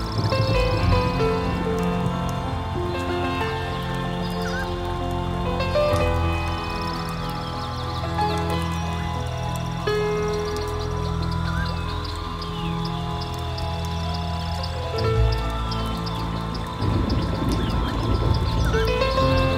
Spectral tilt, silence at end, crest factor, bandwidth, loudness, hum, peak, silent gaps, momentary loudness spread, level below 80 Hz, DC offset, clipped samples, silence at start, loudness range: -6.5 dB/octave; 0 s; 16 dB; 16 kHz; -25 LUFS; none; -6 dBFS; none; 7 LU; -30 dBFS; under 0.1%; under 0.1%; 0 s; 4 LU